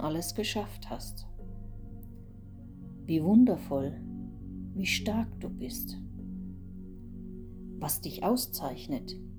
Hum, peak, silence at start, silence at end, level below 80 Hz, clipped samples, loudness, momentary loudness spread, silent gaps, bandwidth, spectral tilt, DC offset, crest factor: none; -12 dBFS; 0 s; 0 s; -48 dBFS; under 0.1%; -32 LUFS; 20 LU; none; over 20 kHz; -5 dB/octave; under 0.1%; 20 dB